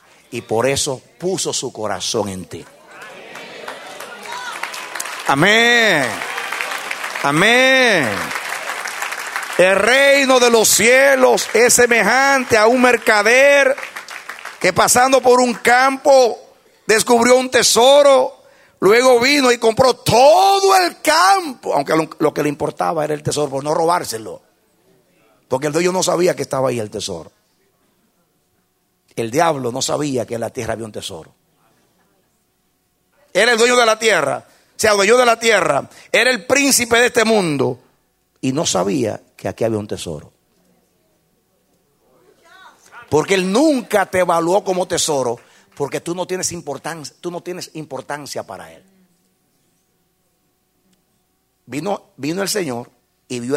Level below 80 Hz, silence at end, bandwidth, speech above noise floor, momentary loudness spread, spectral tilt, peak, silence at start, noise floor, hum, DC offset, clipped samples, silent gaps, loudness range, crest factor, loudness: -56 dBFS; 0 s; 16 kHz; 50 dB; 18 LU; -3 dB/octave; 0 dBFS; 0.3 s; -65 dBFS; none; under 0.1%; under 0.1%; none; 14 LU; 16 dB; -15 LUFS